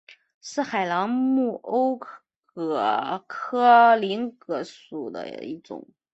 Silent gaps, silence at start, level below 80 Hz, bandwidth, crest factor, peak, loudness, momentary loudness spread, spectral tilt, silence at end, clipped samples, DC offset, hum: none; 0.45 s; -74 dBFS; 8 kHz; 20 dB; -4 dBFS; -23 LUFS; 20 LU; -5 dB/octave; 0.3 s; under 0.1%; under 0.1%; none